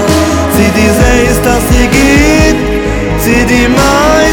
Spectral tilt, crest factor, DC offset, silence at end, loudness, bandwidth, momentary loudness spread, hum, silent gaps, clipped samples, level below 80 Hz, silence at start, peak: -5 dB/octave; 8 dB; 0.3%; 0 s; -8 LUFS; 20 kHz; 6 LU; none; none; 1%; -16 dBFS; 0 s; 0 dBFS